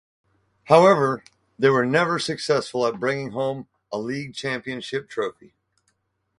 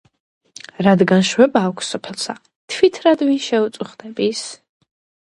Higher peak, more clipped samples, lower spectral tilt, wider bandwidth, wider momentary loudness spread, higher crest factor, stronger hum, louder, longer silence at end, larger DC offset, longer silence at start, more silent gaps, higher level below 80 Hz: about the same, 0 dBFS vs 0 dBFS; neither; about the same, -5.5 dB/octave vs -5 dB/octave; about the same, 11.5 kHz vs 11.5 kHz; second, 14 LU vs 17 LU; first, 24 dB vs 18 dB; neither; second, -22 LUFS vs -17 LUFS; first, 1.1 s vs 0.7 s; neither; second, 0.65 s vs 0.8 s; second, none vs 2.56-2.68 s; about the same, -64 dBFS vs -62 dBFS